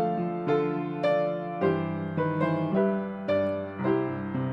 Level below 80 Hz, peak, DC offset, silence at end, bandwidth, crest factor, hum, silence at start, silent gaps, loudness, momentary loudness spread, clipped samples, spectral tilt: -66 dBFS; -12 dBFS; under 0.1%; 0 s; 6 kHz; 16 dB; none; 0 s; none; -28 LUFS; 4 LU; under 0.1%; -9.5 dB/octave